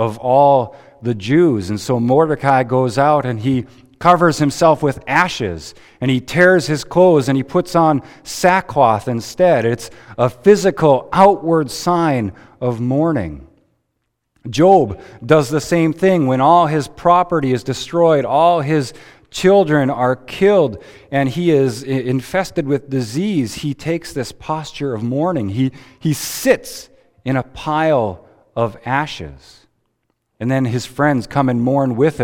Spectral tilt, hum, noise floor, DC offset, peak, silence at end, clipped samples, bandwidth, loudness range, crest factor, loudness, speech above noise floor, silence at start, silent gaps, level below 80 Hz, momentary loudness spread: -6 dB/octave; none; -72 dBFS; under 0.1%; 0 dBFS; 0 s; under 0.1%; 17.5 kHz; 6 LU; 16 dB; -16 LUFS; 56 dB; 0 s; none; -48 dBFS; 12 LU